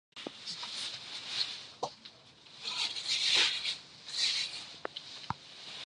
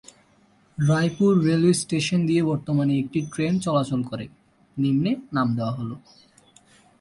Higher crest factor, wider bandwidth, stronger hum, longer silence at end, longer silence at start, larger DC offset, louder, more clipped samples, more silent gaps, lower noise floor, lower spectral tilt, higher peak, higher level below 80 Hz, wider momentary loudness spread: first, 22 dB vs 16 dB; about the same, 11.5 kHz vs 11.5 kHz; neither; second, 0 s vs 1 s; second, 0.15 s vs 0.8 s; neither; second, -33 LUFS vs -23 LUFS; neither; neither; about the same, -56 dBFS vs -59 dBFS; second, 0 dB/octave vs -6.5 dB/octave; second, -16 dBFS vs -8 dBFS; second, -72 dBFS vs -58 dBFS; first, 17 LU vs 14 LU